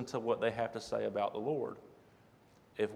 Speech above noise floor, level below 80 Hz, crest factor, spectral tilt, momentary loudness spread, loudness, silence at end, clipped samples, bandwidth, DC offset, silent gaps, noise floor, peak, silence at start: 28 dB; -72 dBFS; 18 dB; -5.5 dB/octave; 10 LU; -37 LUFS; 0 s; under 0.1%; 13 kHz; under 0.1%; none; -64 dBFS; -18 dBFS; 0 s